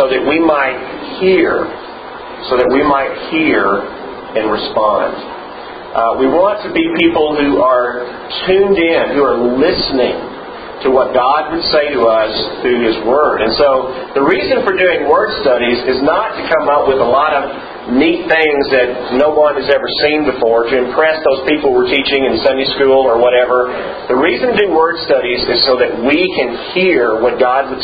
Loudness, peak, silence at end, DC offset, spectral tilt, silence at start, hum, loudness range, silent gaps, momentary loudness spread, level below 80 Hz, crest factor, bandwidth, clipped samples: -12 LUFS; 0 dBFS; 0 s; under 0.1%; -7.5 dB/octave; 0 s; none; 2 LU; none; 8 LU; -42 dBFS; 12 dB; 5 kHz; under 0.1%